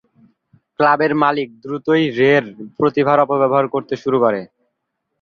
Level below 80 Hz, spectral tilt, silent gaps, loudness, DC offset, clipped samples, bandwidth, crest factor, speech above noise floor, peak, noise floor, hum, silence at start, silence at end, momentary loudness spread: -60 dBFS; -7.5 dB/octave; none; -17 LUFS; under 0.1%; under 0.1%; 7 kHz; 16 dB; 59 dB; 0 dBFS; -75 dBFS; none; 0.8 s; 0.75 s; 10 LU